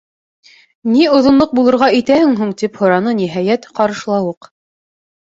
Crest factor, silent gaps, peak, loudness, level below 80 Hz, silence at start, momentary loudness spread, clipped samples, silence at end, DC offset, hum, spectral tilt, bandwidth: 12 dB; none; -2 dBFS; -13 LUFS; -52 dBFS; 0.85 s; 8 LU; under 0.1%; 1.05 s; under 0.1%; none; -6 dB/octave; 7.8 kHz